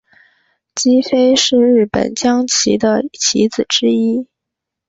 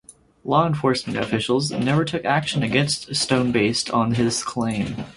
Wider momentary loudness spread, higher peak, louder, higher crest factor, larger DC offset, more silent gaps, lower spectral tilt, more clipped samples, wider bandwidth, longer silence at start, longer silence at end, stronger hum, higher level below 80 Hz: about the same, 6 LU vs 5 LU; about the same, -2 dBFS vs -4 dBFS; first, -13 LUFS vs -21 LUFS; about the same, 14 dB vs 18 dB; neither; neither; second, -3 dB/octave vs -4.5 dB/octave; neither; second, 8 kHz vs 11.5 kHz; first, 0.75 s vs 0.1 s; first, 0.65 s vs 0.05 s; neither; about the same, -50 dBFS vs -52 dBFS